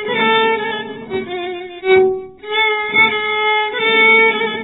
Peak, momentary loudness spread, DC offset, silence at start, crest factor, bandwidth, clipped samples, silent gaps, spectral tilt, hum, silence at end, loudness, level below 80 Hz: -2 dBFS; 15 LU; under 0.1%; 0 s; 14 dB; 4 kHz; under 0.1%; none; -6.5 dB/octave; none; 0 s; -14 LUFS; -58 dBFS